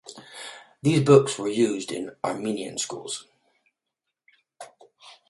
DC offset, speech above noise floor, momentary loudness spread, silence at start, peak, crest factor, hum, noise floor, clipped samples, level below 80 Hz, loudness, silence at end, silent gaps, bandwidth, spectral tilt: under 0.1%; 61 dB; 24 LU; 0.05 s; -2 dBFS; 24 dB; none; -84 dBFS; under 0.1%; -66 dBFS; -24 LUFS; 0.15 s; none; 11.5 kHz; -5.5 dB/octave